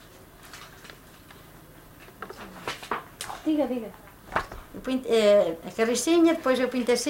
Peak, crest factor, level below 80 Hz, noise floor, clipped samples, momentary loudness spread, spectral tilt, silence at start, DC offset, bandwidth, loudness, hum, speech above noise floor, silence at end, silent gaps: -10 dBFS; 18 dB; -54 dBFS; -49 dBFS; under 0.1%; 23 LU; -3.5 dB/octave; 0.4 s; under 0.1%; 16.5 kHz; -25 LUFS; none; 26 dB; 0 s; none